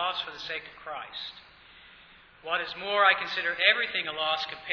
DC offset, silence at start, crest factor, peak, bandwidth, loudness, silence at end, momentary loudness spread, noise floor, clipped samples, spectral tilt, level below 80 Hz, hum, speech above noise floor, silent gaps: under 0.1%; 0 s; 24 dB; -6 dBFS; 5.4 kHz; -27 LUFS; 0 s; 17 LU; -54 dBFS; under 0.1%; -2.5 dB/octave; -68 dBFS; none; 25 dB; none